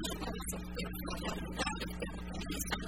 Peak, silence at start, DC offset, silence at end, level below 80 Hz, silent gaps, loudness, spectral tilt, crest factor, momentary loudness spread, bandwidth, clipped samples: -22 dBFS; 0 s; 0.2%; 0 s; -46 dBFS; none; -40 LUFS; -4 dB/octave; 18 dB; 4 LU; 16 kHz; under 0.1%